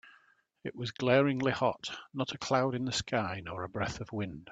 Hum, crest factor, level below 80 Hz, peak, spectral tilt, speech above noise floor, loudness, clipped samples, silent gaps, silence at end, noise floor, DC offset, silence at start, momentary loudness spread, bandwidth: none; 22 dB; -62 dBFS; -10 dBFS; -5 dB/octave; 34 dB; -32 LUFS; under 0.1%; none; 0 s; -67 dBFS; under 0.1%; 0.05 s; 13 LU; 9.2 kHz